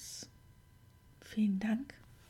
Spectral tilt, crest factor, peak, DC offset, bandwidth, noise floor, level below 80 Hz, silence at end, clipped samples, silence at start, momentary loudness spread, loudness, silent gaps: -5.5 dB/octave; 16 dB; -24 dBFS; under 0.1%; 15 kHz; -62 dBFS; -66 dBFS; 0.15 s; under 0.1%; 0 s; 19 LU; -36 LUFS; none